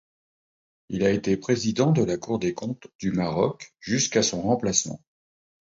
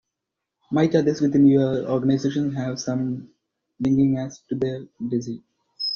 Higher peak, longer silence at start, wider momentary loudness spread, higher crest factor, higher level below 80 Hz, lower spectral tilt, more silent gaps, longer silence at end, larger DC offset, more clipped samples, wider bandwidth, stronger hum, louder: about the same, -6 dBFS vs -6 dBFS; first, 0.9 s vs 0.7 s; about the same, 12 LU vs 12 LU; about the same, 20 dB vs 16 dB; about the same, -56 dBFS vs -58 dBFS; second, -4.5 dB/octave vs -7 dB/octave; first, 2.95-2.99 s vs none; first, 0.65 s vs 0 s; neither; neither; first, 8 kHz vs 7 kHz; neither; second, -25 LUFS vs -22 LUFS